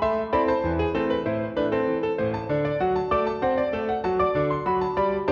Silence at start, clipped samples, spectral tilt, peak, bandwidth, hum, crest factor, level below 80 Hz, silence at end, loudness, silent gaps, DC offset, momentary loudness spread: 0 s; under 0.1%; -8.5 dB/octave; -10 dBFS; 6.8 kHz; none; 14 dB; -44 dBFS; 0 s; -24 LUFS; none; under 0.1%; 3 LU